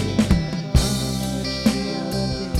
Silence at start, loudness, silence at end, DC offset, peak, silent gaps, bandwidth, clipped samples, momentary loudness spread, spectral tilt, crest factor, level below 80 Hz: 0 s; -22 LUFS; 0 s; under 0.1%; -4 dBFS; none; 17 kHz; under 0.1%; 5 LU; -5.5 dB/octave; 18 dB; -28 dBFS